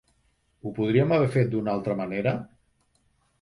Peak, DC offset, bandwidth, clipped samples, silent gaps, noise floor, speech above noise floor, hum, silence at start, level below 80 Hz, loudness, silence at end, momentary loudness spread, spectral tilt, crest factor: -8 dBFS; under 0.1%; 11.5 kHz; under 0.1%; none; -68 dBFS; 44 dB; none; 0.65 s; -60 dBFS; -25 LUFS; 0.95 s; 15 LU; -8.5 dB/octave; 18 dB